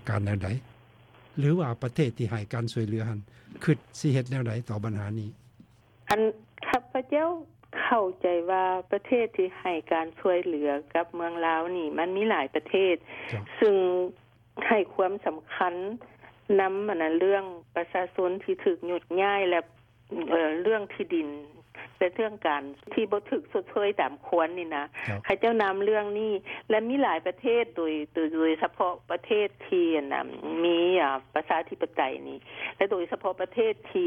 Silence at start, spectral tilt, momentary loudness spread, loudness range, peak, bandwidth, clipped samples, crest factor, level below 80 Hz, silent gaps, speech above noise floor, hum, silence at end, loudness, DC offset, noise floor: 0.05 s; -7 dB/octave; 9 LU; 3 LU; -10 dBFS; 12 kHz; under 0.1%; 18 dB; -66 dBFS; none; 30 dB; none; 0 s; -28 LUFS; under 0.1%; -57 dBFS